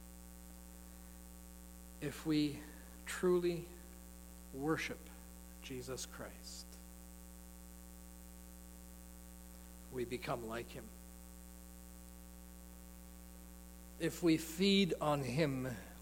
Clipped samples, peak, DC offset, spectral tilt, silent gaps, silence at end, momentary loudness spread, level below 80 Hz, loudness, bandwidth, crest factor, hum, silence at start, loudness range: under 0.1%; -20 dBFS; under 0.1%; -5 dB/octave; none; 0 s; 20 LU; -58 dBFS; -39 LUFS; 17 kHz; 22 dB; 60 Hz at -55 dBFS; 0 s; 16 LU